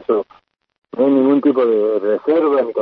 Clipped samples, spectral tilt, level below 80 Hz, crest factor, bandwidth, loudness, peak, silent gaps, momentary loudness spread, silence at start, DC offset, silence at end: under 0.1%; -9.5 dB/octave; -68 dBFS; 12 dB; 4.5 kHz; -16 LUFS; -4 dBFS; 0.78-0.82 s; 7 LU; 0 s; under 0.1%; 0 s